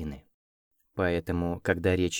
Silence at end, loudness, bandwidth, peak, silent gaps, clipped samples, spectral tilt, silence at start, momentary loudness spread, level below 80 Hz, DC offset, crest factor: 0 s; -29 LUFS; 17 kHz; -10 dBFS; 0.34-0.71 s; under 0.1%; -5.5 dB/octave; 0 s; 15 LU; -48 dBFS; under 0.1%; 20 dB